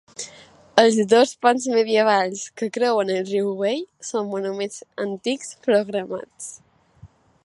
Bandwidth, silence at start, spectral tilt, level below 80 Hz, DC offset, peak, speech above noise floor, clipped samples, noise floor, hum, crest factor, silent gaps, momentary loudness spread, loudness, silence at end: 11.5 kHz; 0.2 s; -3.5 dB/octave; -68 dBFS; under 0.1%; 0 dBFS; 29 dB; under 0.1%; -50 dBFS; none; 22 dB; none; 15 LU; -21 LUFS; 0.4 s